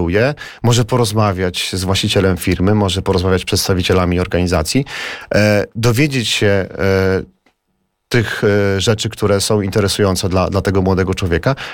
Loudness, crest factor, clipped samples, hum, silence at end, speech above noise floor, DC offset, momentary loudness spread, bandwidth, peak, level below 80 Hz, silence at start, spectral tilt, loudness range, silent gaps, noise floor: -15 LUFS; 14 dB; under 0.1%; none; 0 s; 53 dB; 0.4%; 4 LU; 18 kHz; -2 dBFS; -36 dBFS; 0 s; -5 dB/octave; 1 LU; none; -67 dBFS